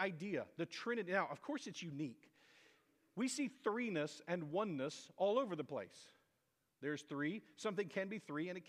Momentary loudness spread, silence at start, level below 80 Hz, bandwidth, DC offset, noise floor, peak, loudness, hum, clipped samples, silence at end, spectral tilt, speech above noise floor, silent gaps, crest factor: 9 LU; 0 s; under -90 dBFS; 15 kHz; under 0.1%; -84 dBFS; -22 dBFS; -43 LUFS; none; under 0.1%; 0 s; -5 dB/octave; 41 dB; none; 22 dB